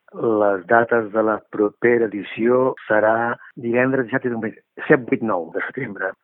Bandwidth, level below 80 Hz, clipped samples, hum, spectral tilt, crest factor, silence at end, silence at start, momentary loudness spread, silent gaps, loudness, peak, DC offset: 3.9 kHz; -68 dBFS; under 0.1%; none; -11.5 dB/octave; 20 dB; 0.1 s; 0.15 s; 10 LU; none; -20 LUFS; 0 dBFS; under 0.1%